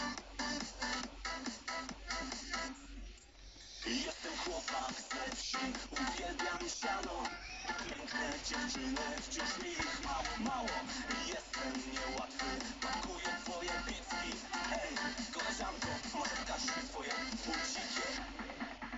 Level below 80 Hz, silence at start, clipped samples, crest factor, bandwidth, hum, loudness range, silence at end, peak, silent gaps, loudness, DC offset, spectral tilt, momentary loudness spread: -54 dBFS; 0 s; under 0.1%; 16 dB; 8.2 kHz; none; 3 LU; 0 s; -24 dBFS; none; -40 LUFS; under 0.1%; -2 dB/octave; 4 LU